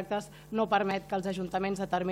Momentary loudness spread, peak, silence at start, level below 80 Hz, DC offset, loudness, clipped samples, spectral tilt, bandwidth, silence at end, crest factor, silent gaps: 8 LU; -12 dBFS; 0 s; -60 dBFS; under 0.1%; -32 LUFS; under 0.1%; -6 dB/octave; 16 kHz; 0 s; 18 dB; none